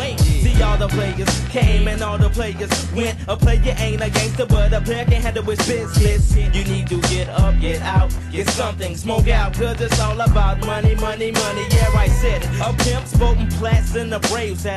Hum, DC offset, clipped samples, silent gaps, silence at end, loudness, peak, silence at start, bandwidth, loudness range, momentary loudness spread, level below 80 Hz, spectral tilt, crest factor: none; under 0.1%; under 0.1%; none; 0 s; -18 LUFS; -4 dBFS; 0 s; 13 kHz; 1 LU; 5 LU; -20 dBFS; -5 dB/octave; 12 dB